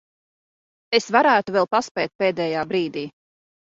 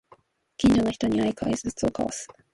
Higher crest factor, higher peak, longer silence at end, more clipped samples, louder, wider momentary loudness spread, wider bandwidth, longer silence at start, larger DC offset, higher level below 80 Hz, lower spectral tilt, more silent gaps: first, 22 dB vs 16 dB; first, -2 dBFS vs -10 dBFS; first, 0.7 s vs 0.3 s; neither; first, -21 LUFS vs -25 LUFS; about the same, 11 LU vs 10 LU; second, 7.8 kHz vs 11.5 kHz; first, 0.9 s vs 0.6 s; neither; second, -66 dBFS vs -46 dBFS; about the same, -4.5 dB/octave vs -5.5 dB/octave; first, 1.91-1.95 s, 2.15-2.19 s vs none